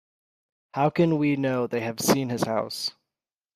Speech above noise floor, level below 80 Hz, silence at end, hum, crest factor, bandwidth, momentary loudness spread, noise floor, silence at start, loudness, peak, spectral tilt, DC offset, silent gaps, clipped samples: over 66 dB; -64 dBFS; 0.65 s; none; 18 dB; 15.5 kHz; 8 LU; under -90 dBFS; 0.75 s; -25 LUFS; -8 dBFS; -5 dB/octave; under 0.1%; none; under 0.1%